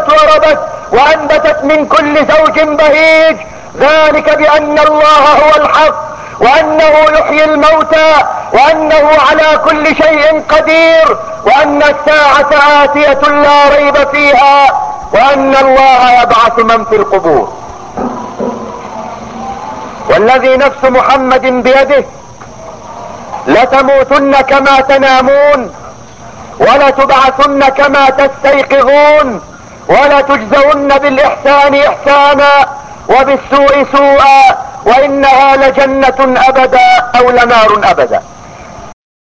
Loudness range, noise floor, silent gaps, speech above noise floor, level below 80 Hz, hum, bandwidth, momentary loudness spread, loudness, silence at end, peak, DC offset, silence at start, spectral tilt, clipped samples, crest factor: 4 LU; -29 dBFS; none; 24 dB; -36 dBFS; none; 8 kHz; 13 LU; -6 LUFS; 0.4 s; 0 dBFS; under 0.1%; 0 s; -4 dB/octave; 3%; 6 dB